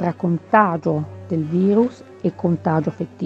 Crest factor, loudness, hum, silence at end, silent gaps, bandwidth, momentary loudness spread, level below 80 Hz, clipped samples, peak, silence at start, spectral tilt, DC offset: 20 dB; -20 LUFS; none; 0 s; none; 7.4 kHz; 10 LU; -62 dBFS; under 0.1%; 0 dBFS; 0 s; -9.5 dB/octave; under 0.1%